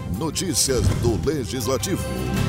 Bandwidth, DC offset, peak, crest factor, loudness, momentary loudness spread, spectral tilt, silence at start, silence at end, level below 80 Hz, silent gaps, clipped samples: 16 kHz; under 0.1%; -8 dBFS; 14 dB; -22 LUFS; 6 LU; -4.5 dB/octave; 0 s; 0 s; -34 dBFS; none; under 0.1%